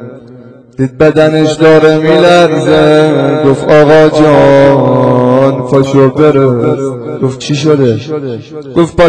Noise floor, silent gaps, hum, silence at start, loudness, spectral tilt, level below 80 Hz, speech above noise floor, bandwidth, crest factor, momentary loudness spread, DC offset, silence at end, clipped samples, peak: -33 dBFS; none; none; 0 s; -7 LUFS; -7 dB/octave; -38 dBFS; 27 dB; 11 kHz; 6 dB; 11 LU; under 0.1%; 0 s; 6%; 0 dBFS